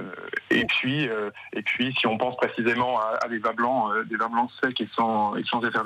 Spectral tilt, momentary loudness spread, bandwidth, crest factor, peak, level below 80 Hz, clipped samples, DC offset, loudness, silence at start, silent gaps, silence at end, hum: -6 dB/octave; 5 LU; 11 kHz; 14 dB; -10 dBFS; -64 dBFS; under 0.1%; under 0.1%; -25 LUFS; 0 s; none; 0 s; none